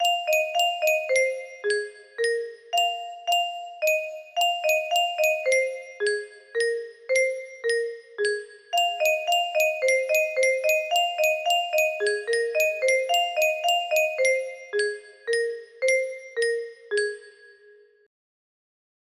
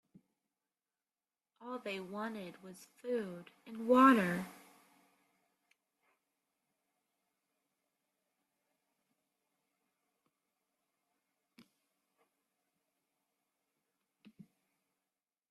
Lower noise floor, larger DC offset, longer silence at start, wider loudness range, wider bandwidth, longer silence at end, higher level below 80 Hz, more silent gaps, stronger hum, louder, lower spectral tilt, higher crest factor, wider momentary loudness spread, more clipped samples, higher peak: second, -55 dBFS vs under -90 dBFS; neither; second, 0 s vs 1.6 s; second, 5 LU vs 12 LU; first, 15.5 kHz vs 13.5 kHz; second, 1.6 s vs 11 s; first, -78 dBFS vs -84 dBFS; neither; neither; first, -24 LUFS vs -33 LUFS; second, 1.5 dB/octave vs -6 dB/octave; second, 16 dB vs 28 dB; second, 9 LU vs 26 LU; neither; first, -10 dBFS vs -14 dBFS